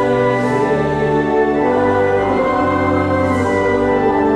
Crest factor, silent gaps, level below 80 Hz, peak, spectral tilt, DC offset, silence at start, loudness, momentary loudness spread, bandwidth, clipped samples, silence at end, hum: 10 dB; none; -38 dBFS; -4 dBFS; -7.5 dB/octave; under 0.1%; 0 s; -15 LUFS; 1 LU; 11.5 kHz; under 0.1%; 0 s; none